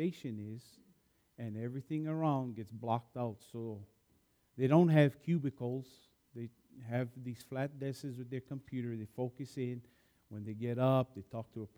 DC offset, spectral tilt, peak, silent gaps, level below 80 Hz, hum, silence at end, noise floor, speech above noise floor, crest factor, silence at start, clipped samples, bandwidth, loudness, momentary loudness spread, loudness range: under 0.1%; -8.5 dB/octave; -14 dBFS; none; -78 dBFS; none; 0.1 s; -73 dBFS; 37 dB; 22 dB; 0 s; under 0.1%; 16 kHz; -37 LUFS; 18 LU; 9 LU